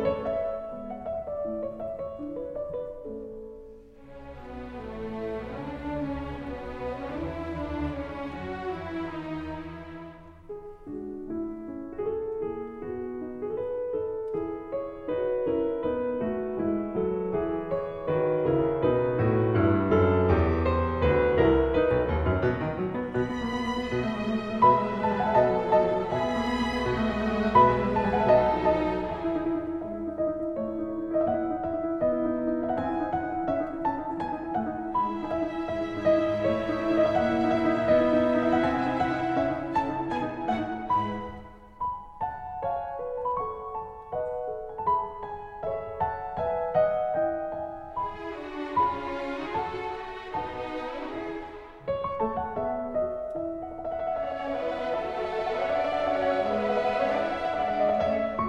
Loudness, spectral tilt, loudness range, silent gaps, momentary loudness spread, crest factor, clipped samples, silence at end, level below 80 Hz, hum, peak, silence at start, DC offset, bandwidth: -28 LUFS; -8 dB/octave; 11 LU; none; 13 LU; 20 dB; under 0.1%; 0 s; -46 dBFS; none; -8 dBFS; 0 s; under 0.1%; 9.2 kHz